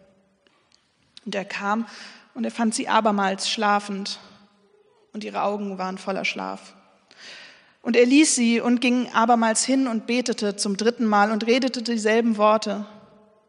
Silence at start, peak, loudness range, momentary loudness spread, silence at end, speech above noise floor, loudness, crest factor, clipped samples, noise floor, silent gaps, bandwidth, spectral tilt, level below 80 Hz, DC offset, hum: 1.25 s; -4 dBFS; 10 LU; 17 LU; 0.5 s; 41 dB; -22 LUFS; 18 dB; under 0.1%; -63 dBFS; none; 10.5 kHz; -3.5 dB/octave; -78 dBFS; under 0.1%; none